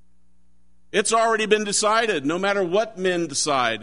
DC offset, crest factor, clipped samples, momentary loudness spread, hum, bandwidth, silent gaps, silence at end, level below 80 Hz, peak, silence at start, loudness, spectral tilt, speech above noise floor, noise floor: 0.5%; 18 dB; under 0.1%; 4 LU; none; 11 kHz; none; 0 s; -62 dBFS; -4 dBFS; 0.95 s; -21 LUFS; -2.5 dB/octave; 43 dB; -64 dBFS